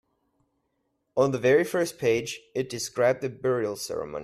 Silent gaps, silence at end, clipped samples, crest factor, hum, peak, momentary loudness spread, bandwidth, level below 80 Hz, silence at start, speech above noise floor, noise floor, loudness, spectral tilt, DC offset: none; 0 s; under 0.1%; 18 dB; none; -10 dBFS; 10 LU; 15.5 kHz; -64 dBFS; 1.15 s; 50 dB; -76 dBFS; -26 LUFS; -4.5 dB/octave; under 0.1%